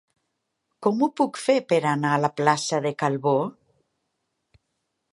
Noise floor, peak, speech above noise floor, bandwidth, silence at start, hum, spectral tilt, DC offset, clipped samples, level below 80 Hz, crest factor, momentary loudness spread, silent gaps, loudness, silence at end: -78 dBFS; -4 dBFS; 56 dB; 11.5 kHz; 0.8 s; none; -5.5 dB/octave; under 0.1%; under 0.1%; -74 dBFS; 22 dB; 4 LU; none; -23 LUFS; 1.6 s